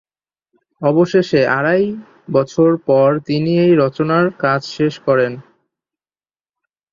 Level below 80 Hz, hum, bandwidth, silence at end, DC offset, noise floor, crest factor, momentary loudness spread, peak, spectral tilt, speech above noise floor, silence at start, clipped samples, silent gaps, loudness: -58 dBFS; none; 7.4 kHz; 1.5 s; under 0.1%; under -90 dBFS; 14 dB; 7 LU; -2 dBFS; -7.5 dB/octave; over 76 dB; 0.8 s; under 0.1%; none; -15 LUFS